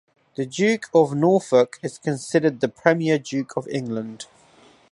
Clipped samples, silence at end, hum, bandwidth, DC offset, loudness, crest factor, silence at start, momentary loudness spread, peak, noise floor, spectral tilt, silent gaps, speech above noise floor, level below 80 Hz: under 0.1%; 0.7 s; none; 11.5 kHz; under 0.1%; -22 LUFS; 20 dB; 0.4 s; 13 LU; -2 dBFS; -53 dBFS; -6 dB/octave; none; 32 dB; -70 dBFS